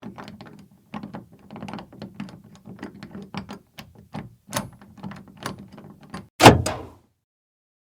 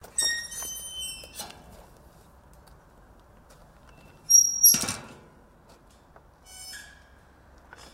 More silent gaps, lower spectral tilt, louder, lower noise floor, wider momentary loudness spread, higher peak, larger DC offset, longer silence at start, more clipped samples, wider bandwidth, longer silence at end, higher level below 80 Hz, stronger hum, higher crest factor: first, 6.30-6.39 s vs none; first, -4.5 dB/octave vs 1 dB/octave; first, -17 LUFS vs -21 LUFS; second, -48 dBFS vs -55 dBFS; first, 28 LU vs 24 LU; first, 0 dBFS vs -6 dBFS; neither; about the same, 0.05 s vs 0.15 s; neither; first, over 20 kHz vs 16 kHz; about the same, 1 s vs 1.1 s; first, -48 dBFS vs -58 dBFS; neither; about the same, 26 dB vs 26 dB